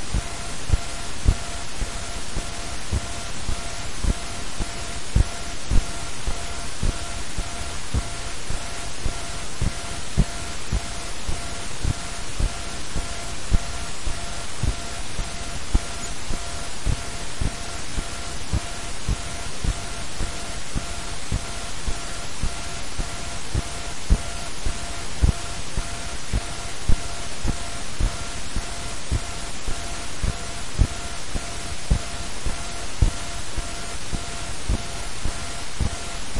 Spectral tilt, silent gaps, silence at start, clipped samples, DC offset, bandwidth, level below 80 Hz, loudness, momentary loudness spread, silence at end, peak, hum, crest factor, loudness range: -3.5 dB/octave; none; 0 s; under 0.1%; 4%; 11.5 kHz; -28 dBFS; -29 LUFS; 6 LU; 0 s; -2 dBFS; none; 24 dB; 2 LU